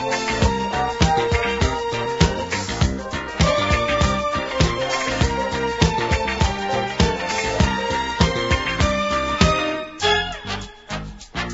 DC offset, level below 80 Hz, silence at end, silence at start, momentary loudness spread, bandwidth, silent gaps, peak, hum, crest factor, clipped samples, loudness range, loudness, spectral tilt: under 0.1%; -30 dBFS; 0 s; 0 s; 8 LU; 8 kHz; none; -2 dBFS; none; 20 dB; under 0.1%; 1 LU; -20 LUFS; -4.5 dB/octave